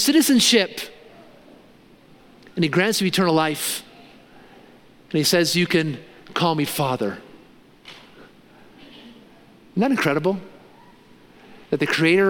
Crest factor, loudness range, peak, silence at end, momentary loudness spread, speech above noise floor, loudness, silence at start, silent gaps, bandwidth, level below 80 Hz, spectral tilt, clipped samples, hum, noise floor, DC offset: 20 dB; 6 LU; -4 dBFS; 0 s; 16 LU; 31 dB; -20 LUFS; 0 s; none; 17 kHz; -64 dBFS; -4 dB/octave; under 0.1%; none; -51 dBFS; under 0.1%